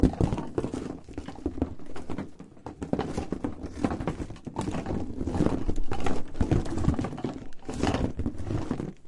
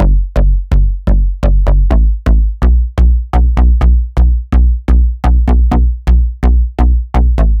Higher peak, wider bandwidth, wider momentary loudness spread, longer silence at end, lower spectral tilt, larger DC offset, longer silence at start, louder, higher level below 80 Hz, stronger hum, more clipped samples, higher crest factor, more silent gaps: second, -6 dBFS vs 0 dBFS; first, 11.5 kHz vs 3.8 kHz; first, 11 LU vs 3 LU; about the same, 0 s vs 0 s; second, -7.5 dB/octave vs -9 dB/octave; neither; about the same, 0 s vs 0 s; second, -32 LUFS vs -12 LUFS; second, -38 dBFS vs -8 dBFS; neither; neither; first, 22 dB vs 8 dB; neither